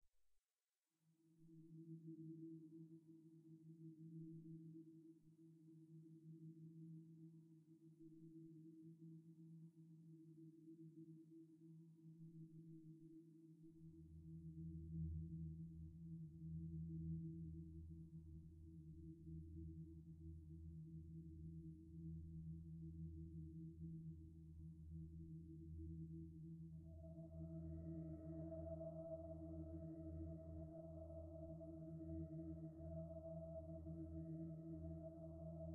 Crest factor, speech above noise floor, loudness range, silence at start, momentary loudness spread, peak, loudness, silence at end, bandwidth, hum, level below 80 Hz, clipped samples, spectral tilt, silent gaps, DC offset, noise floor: 16 dB; over 29 dB; 10 LU; 0.05 s; 12 LU; -40 dBFS; -57 LUFS; 0 s; 1.5 kHz; none; -66 dBFS; under 0.1%; -13.5 dB/octave; none; under 0.1%; under -90 dBFS